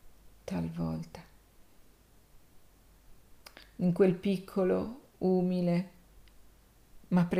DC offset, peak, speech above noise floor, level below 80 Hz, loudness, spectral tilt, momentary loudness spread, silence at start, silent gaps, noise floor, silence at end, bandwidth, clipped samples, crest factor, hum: under 0.1%; -14 dBFS; 31 dB; -60 dBFS; -31 LUFS; -8.5 dB/octave; 22 LU; 0.05 s; none; -60 dBFS; 0 s; 15 kHz; under 0.1%; 20 dB; none